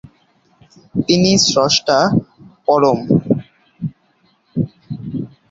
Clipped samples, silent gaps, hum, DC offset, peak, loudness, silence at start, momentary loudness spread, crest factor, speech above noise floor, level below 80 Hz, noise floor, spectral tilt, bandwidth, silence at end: under 0.1%; none; none; under 0.1%; 0 dBFS; -16 LUFS; 0.95 s; 16 LU; 18 dB; 45 dB; -50 dBFS; -58 dBFS; -4.5 dB/octave; 8 kHz; 0.25 s